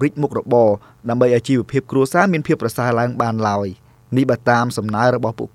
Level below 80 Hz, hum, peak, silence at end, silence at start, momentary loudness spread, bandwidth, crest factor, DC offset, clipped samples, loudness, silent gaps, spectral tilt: -54 dBFS; none; 0 dBFS; 0.05 s; 0 s; 7 LU; 15 kHz; 18 dB; under 0.1%; under 0.1%; -18 LUFS; none; -7 dB/octave